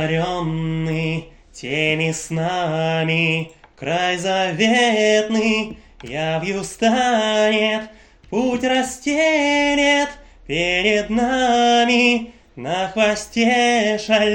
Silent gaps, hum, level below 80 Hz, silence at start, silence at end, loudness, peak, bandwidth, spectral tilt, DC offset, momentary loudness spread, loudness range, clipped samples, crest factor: none; none; -48 dBFS; 0 s; 0 s; -18 LUFS; -2 dBFS; 16.5 kHz; -4 dB/octave; under 0.1%; 11 LU; 4 LU; under 0.1%; 16 dB